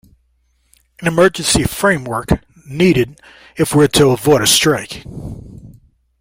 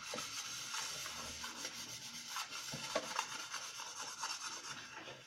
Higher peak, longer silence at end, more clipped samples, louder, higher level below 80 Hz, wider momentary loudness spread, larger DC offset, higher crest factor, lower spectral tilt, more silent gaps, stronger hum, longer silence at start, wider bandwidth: first, 0 dBFS vs -20 dBFS; first, 0.5 s vs 0 s; neither; first, -14 LUFS vs -43 LUFS; first, -36 dBFS vs -74 dBFS; first, 19 LU vs 5 LU; neither; second, 16 dB vs 24 dB; first, -4 dB/octave vs -0.5 dB/octave; neither; neither; first, 1 s vs 0 s; about the same, 16.5 kHz vs 16 kHz